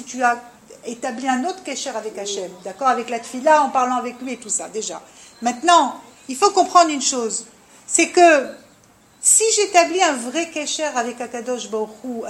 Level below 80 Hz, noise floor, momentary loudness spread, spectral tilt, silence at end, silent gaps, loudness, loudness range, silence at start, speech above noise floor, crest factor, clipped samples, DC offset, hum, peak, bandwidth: -68 dBFS; -52 dBFS; 15 LU; -1 dB/octave; 0 s; none; -19 LUFS; 5 LU; 0 s; 33 dB; 20 dB; under 0.1%; under 0.1%; none; 0 dBFS; 15.5 kHz